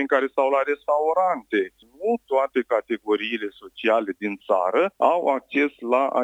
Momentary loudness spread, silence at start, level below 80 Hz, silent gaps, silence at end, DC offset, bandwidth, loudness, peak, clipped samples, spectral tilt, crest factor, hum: 8 LU; 0 s; -70 dBFS; none; 0 s; under 0.1%; 9.2 kHz; -23 LUFS; -4 dBFS; under 0.1%; -5.5 dB/octave; 18 dB; none